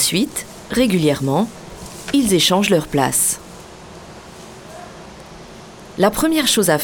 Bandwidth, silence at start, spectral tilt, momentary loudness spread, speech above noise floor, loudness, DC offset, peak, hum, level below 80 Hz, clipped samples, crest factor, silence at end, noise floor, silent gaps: over 20 kHz; 0 s; -3.5 dB/octave; 24 LU; 22 dB; -17 LUFS; under 0.1%; -2 dBFS; none; -44 dBFS; under 0.1%; 18 dB; 0 s; -38 dBFS; none